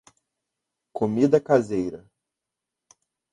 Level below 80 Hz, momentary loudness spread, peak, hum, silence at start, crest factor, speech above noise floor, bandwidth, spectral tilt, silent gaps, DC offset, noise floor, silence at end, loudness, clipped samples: -62 dBFS; 18 LU; -4 dBFS; none; 0.95 s; 22 dB; 64 dB; 11 kHz; -7.5 dB/octave; none; under 0.1%; -86 dBFS; 1.35 s; -23 LUFS; under 0.1%